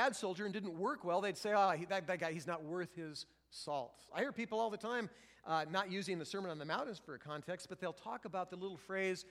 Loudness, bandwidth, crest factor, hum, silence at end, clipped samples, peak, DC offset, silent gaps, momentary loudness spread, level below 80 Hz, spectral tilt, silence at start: -41 LUFS; 15.5 kHz; 20 dB; none; 0 s; under 0.1%; -20 dBFS; under 0.1%; none; 11 LU; -80 dBFS; -4.5 dB/octave; 0 s